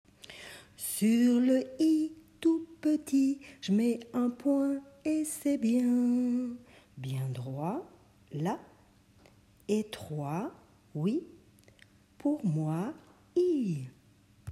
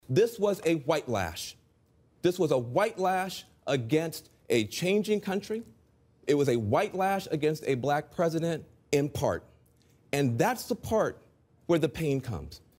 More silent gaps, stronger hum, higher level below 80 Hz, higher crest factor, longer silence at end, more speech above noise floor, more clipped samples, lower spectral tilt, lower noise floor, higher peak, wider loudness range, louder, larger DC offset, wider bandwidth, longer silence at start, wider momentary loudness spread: neither; neither; second, -70 dBFS vs -58 dBFS; second, 14 dB vs 20 dB; second, 0 s vs 0.2 s; second, 32 dB vs 37 dB; neither; about the same, -6.5 dB/octave vs -5.5 dB/octave; about the same, -62 dBFS vs -65 dBFS; second, -16 dBFS vs -10 dBFS; first, 9 LU vs 2 LU; about the same, -31 LUFS vs -29 LUFS; neither; second, 14.5 kHz vs 16 kHz; first, 0.3 s vs 0.1 s; first, 16 LU vs 11 LU